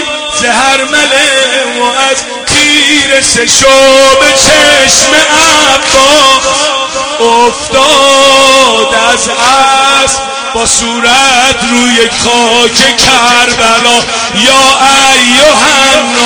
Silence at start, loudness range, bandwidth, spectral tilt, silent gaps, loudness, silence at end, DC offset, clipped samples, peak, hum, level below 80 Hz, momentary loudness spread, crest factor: 0 s; 3 LU; over 20 kHz; -1 dB/octave; none; -4 LUFS; 0 s; under 0.1%; 5%; 0 dBFS; none; -34 dBFS; 6 LU; 6 dB